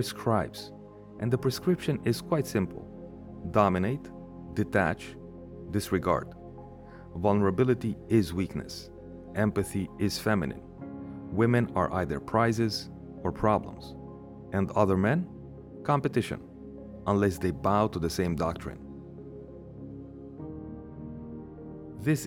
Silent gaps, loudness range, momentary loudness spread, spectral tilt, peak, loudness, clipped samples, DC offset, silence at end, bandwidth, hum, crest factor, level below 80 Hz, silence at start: none; 4 LU; 19 LU; -6.5 dB/octave; -8 dBFS; -29 LUFS; under 0.1%; under 0.1%; 0 s; 17.5 kHz; none; 22 dB; -52 dBFS; 0 s